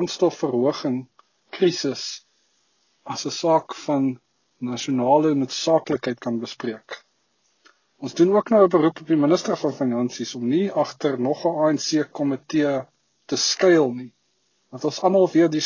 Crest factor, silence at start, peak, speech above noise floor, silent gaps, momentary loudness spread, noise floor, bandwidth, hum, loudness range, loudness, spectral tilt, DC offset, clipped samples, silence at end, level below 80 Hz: 18 dB; 0 s; -4 dBFS; 47 dB; none; 15 LU; -68 dBFS; 7.4 kHz; none; 5 LU; -22 LUFS; -5 dB/octave; under 0.1%; under 0.1%; 0 s; -70 dBFS